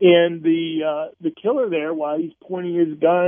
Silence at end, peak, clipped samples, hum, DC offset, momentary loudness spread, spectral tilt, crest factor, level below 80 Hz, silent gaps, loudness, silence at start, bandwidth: 0 s; -4 dBFS; under 0.1%; none; under 0.1%; 10 LU; -10.5 dB/octave; 16 dB; -70 dBFS; none; -21 LUFS; 0 s; 3.6 kHz